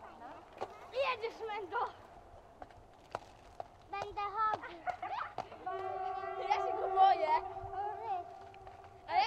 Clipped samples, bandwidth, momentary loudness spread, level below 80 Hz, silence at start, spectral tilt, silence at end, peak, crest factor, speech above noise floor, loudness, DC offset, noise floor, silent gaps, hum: under 0.1%; 8.6 kHz; 21 LU; -66 dBFS; 0 s; -4.5 dB/octave; 0 s; -16 dBFS; 22 dB; 19 dB; -37 LUFS; under 0.1%; -58 dBFS; none; none